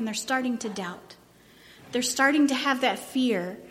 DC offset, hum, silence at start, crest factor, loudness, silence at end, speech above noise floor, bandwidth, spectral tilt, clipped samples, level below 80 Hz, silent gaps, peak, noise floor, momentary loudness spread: under 0.1%; none; 0 s; 18 dB; -26 LUFS; 0 s; 28 dB; 16.5 kHz; -3 dB/octave; under 0.1%; -70 dBFS; none; -8 dBFS; -54 dBFS; 13 LU